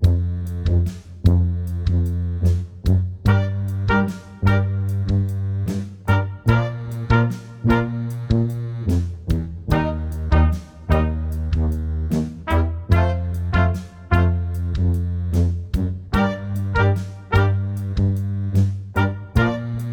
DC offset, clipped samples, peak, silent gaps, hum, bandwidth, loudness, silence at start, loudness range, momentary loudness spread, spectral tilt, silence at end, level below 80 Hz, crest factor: under 0.1%; under 0.1%; -2 dBFS; none; none; 9.4 kHz; -21 LUFS; 0 s; 1 LU; 6 LU; -8 dB/octave; 0 s; -28 dBFS; 18 dB